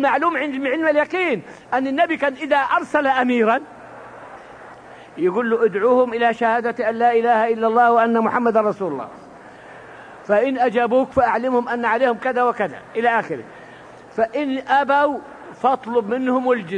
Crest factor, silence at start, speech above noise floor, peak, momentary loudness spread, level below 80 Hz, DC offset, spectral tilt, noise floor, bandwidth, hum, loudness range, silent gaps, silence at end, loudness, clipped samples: 16 dB; 0 s; 23 dB; -4 dBFS; 19 LU; -60 dBFS; under 0.1%; -6 dB/octave; -41 dBFS; 10 kHz; none; 4 LU; none; 0 s; -19 LUFS; under 0.1%